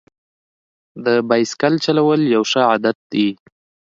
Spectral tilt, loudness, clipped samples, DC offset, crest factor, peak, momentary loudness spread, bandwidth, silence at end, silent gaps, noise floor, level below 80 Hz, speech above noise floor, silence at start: -5 dB/octave; -17 LUFS; under 0.1%; under 0.1%; 18 dB; 0 dBFS; 5 LU; 7.8 kHz; 0.55 s; 2.95-3.10 s; under -90 dBFS; -66 dBFS; over 74 dB; 0.95 s